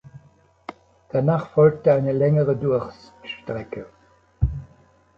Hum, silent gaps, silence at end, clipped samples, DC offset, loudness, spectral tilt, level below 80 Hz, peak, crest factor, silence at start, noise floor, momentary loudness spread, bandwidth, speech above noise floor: none; none; 0.5 s; under 0.1%; under 0.1%; -21 LUFS; -9.5 dB/octave; -38 dBFS; -4 dBFS; 18 dB; 0.15 s; -56 dBFS; 23 LU; 6 kHz; 36 dB